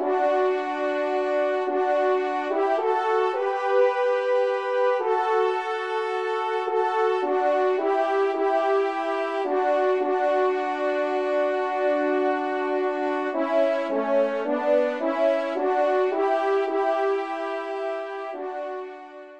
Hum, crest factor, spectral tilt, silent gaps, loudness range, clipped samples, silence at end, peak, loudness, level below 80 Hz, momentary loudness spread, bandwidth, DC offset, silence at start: none; 14 dB; -4 dB/octave; none; 1 LU; under 0.1%; 0 s; -10 dBFS; -24 LUFS; -78 dBFS; 5 LU; 8.6 kHz; 0.1%; 0 s